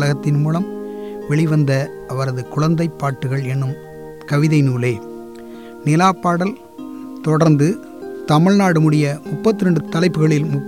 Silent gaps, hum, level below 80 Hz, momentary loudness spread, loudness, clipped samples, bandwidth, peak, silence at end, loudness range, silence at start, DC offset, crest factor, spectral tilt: none; none; -54 dBFS; 18 LU; -17 LUFS; under 0.1%; 13 kHz; -4 dBFS; 0 s; 4 LU; 0 s; 0.3%; 14 dB; -7 dB/octave